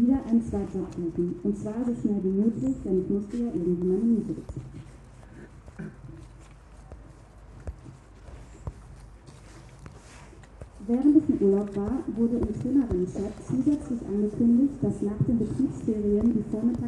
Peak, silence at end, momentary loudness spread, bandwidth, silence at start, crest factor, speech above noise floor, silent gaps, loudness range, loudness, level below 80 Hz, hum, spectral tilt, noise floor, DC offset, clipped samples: -8 dBFS; 0 s; 24 LU; 10 kHz; 0 s; 18 dB; 23 dB; none; 20 LU; -26 LUFS; -46 dBFS; none; -9.5 dB/octave; -48 dBFS; under 0.1%; under 0.1%